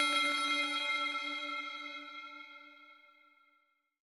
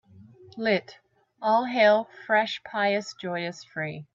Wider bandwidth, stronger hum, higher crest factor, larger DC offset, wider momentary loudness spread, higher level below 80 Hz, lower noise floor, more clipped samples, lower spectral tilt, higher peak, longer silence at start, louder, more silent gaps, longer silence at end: first, 17 kHz vs 7.6 kHz; neither; about the same, 20 dB vs 18 dB; neither; first, 20 LU vs 13 LU; second, under -90 dBFS vs -74 dBFS; first, -76 dBFS vs -51 dBFS; neither; second, 1.5 dB/octave vs -5 dB/octave; second, -18 dBFS vs -8 dBFS; second, 0 s vs 0.2 s; second, -34 LUFS vs -26 LUFS; neither; first, 1.1 s vs 0.1 s